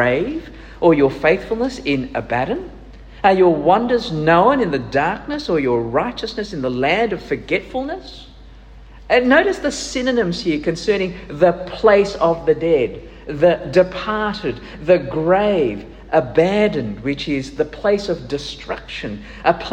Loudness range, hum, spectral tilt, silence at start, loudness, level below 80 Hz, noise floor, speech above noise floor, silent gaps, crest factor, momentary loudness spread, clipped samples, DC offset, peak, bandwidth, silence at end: 4 LU; none; -6 dB/octave; 0 s; -18 LUFS; -40 dBFS; -40 dBFS; 23 dB; none; 18 dB; 12 LU; under 0.1%; under 0.1%; 0 dBFS; 9.8 kHz; 0 s